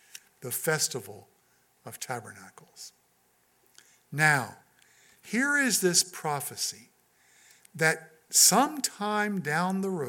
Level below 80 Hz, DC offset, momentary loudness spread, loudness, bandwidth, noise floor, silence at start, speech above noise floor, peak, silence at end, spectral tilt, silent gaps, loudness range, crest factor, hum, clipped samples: -82 dBFS; under 0.1%; 25 LU; -26 LUFS; 17.5 kHz; -68 dBFS; 0.15 s; 40 dB; -8 dBFS; 0 s; -2.5 dB/octave; none; 9 LU; 22 dB; 60 Hz at -65 dBFS; under 0.1%